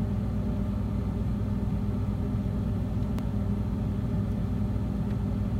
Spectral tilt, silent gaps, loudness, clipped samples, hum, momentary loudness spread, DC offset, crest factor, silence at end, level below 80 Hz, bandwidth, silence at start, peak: -9.5 dB/octave; none; -30 LUFS; under 0.1%; none; 1 LU; under 0.1%; 12 dB; 0 s; -34 dBFS; 9.8 kHz; 0 s; -18 dBFS